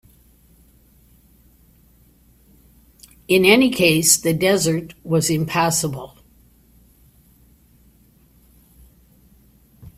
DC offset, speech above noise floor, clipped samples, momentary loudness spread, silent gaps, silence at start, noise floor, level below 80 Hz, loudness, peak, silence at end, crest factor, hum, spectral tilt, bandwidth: under 0.1%; 37 dB; under 0.1%; 13 LU; none; 3.3 s; -54 dBFS; -52 dBFS; -17 LUFS; 0 dBFS; 0.1 s; 22 dB; none; -3.5 dB/octave; 16 kHz